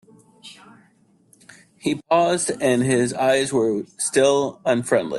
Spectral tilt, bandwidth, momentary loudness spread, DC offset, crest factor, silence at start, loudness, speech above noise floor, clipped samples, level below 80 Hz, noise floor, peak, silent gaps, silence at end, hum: -4 dB/octave; 12.5 kHz; 6 LU; under 0.1%; 16 dB; 0.45 s; -20 LUFS; 39 dB; under 0.1%; -62 dBFS; -58 dBFS; -4 dBFS; none; 0 s; none